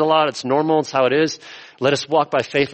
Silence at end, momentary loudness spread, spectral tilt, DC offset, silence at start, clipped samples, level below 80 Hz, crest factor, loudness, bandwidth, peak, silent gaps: 0 s; 6 LU; -4.5 dB/octave; under 0.1%; 0 s; under 0.1%; -60 dBFS; 14 dB; -18 LUFS; 8.8 kHz; -4 dBFS; none